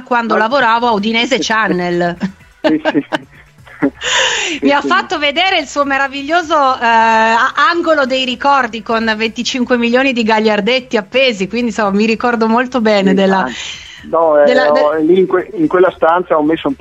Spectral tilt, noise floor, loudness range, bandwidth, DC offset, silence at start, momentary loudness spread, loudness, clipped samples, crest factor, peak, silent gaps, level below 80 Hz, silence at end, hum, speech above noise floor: -4 dB/octave; -39 dBFS; 3 LU; 8.4 kHz; under 0.1%; 0 s; 7 LU; -12 LUFS; under 0.1%; 12 dB; 0 dBFS; none; -48 dBFS; 0.05 s; none; 27 dB